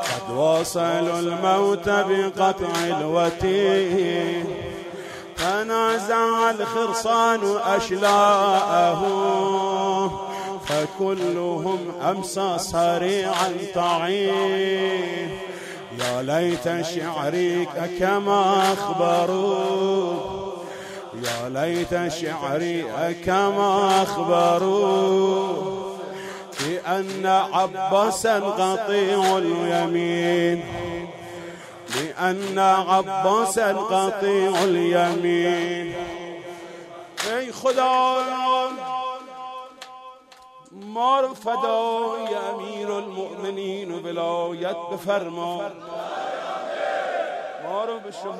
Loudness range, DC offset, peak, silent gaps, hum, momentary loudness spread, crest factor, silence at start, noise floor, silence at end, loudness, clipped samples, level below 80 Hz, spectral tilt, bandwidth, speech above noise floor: 6 LU; under 0.1%; -6 dBFS; none; none; 13 LU; 16 dB; 0 s; -48 dBFS; 0 s; -22 LUFS; under 0.1%; -56 dBFS; -4.5 dB/octave; 15.5 kHz; 26 dB